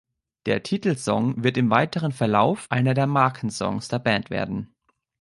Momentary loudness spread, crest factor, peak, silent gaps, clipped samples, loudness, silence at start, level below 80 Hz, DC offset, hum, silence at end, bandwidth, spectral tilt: 8 LU; 20 dB; -4 dBFS; none; under 0.1%; -23 LUFS; 0.45 s; -56 dBFS; under 0.1%; none; 0.55 s; 11.5 kHz; -6 dB/octave